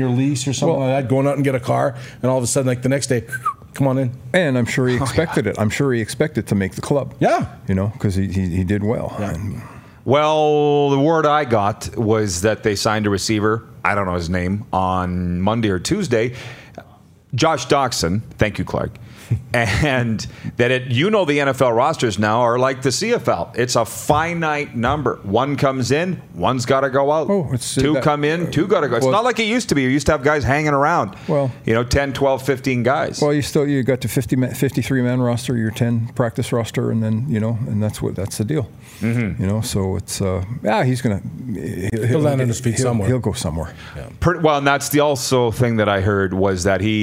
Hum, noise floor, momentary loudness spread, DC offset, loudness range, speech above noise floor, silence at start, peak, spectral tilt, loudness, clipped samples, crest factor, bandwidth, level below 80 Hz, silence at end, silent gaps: none; -47 dBFS; 7 LU; under 0.1%; 4 LU; 29 dB; 0 s; 0 dBFS; -5.5 dB/octave; -19 LUFS; under 0.1%; 18 dB; 16 kHz; -44 dBFS; 0 s; none